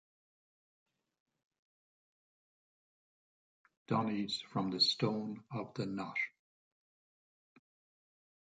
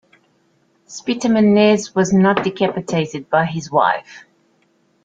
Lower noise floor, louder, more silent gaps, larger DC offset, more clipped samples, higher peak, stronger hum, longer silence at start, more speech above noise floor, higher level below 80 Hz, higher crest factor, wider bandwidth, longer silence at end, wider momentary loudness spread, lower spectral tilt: first, under -90 dBFS vs -60 dBFS; second, -36 LUFS vs -17 LUFS; neither; neither; neither; second, -18 dBFS vs -2 dBFS; neither; first, 3.9 s vs 0.9 s; first, over 54 dB vs 44 dB; second, -80 dBFS vs -58 dBFS; first, 24 dB vs 16 dB; first, 9 kHz vs 7.8 kHz; first, 2.15 s vs 0.85 s; about the same, 12 LU vs 10 LU; about the same, -5 dB/octave vs -6 dB/octave